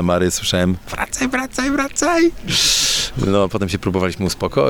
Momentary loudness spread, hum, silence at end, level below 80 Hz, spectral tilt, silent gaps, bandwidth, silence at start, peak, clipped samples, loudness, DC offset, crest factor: 7 LU; none; 0 s; -36 dBFS; -3.5 dB/octave; none; 19.5 kHz; 0 s; -4 dBFS; under 0.1%; -17 LUFS; under 0.1%; 14 dB